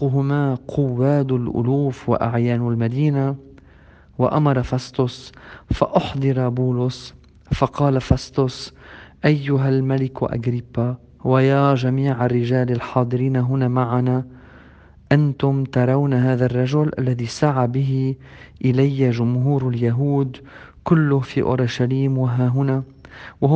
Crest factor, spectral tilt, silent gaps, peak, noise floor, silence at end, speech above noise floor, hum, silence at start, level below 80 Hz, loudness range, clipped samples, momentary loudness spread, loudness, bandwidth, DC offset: 20 dB; -8.5 dB/octave; none; 0 dBFS; -48 dBFS; 0 s; 29 dB; none; 0 s; -44 dBFS; 3 LU; under 0.1%; 8 LU; -20 LUFS; 8 kHz; under 0.1%